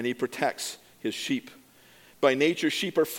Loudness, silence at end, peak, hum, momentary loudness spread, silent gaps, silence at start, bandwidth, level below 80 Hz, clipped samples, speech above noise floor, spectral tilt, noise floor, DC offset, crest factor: -28 LUFS; 0 s; -6 dBFS; none; 12 LU; none; 0 s; 17.5 kHz; -74 dBFS; under 0.1%; 29 dB; -3.5 dB/octave; -56 dBFS; under 0.1%; 22 dB